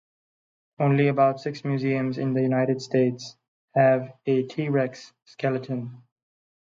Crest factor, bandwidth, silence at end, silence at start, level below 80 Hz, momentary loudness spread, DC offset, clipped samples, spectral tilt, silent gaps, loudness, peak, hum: 18 dB; 7.6 kHz; 0.7 s; 0.8 s; -72 dBFS; 12 LU; under 0.1%; under 0.1%; -7.5 dB/octave; 3.48-3.68 s, 5.22-5.26 s; -24 LUFS; -6 dBFS; none